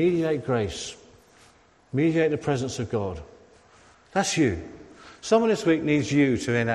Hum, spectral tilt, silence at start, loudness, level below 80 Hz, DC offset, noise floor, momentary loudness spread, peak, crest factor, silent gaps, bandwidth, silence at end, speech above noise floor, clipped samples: none; -5.5 dB/octave; 0 s; -25 LUFS; -54 dBFS; under 0.1%; -57 dBFS; 14 LU; -8 dBFS; 18 dB; none; 12.5 kHz; 0 s; 33 dB; under 0.1%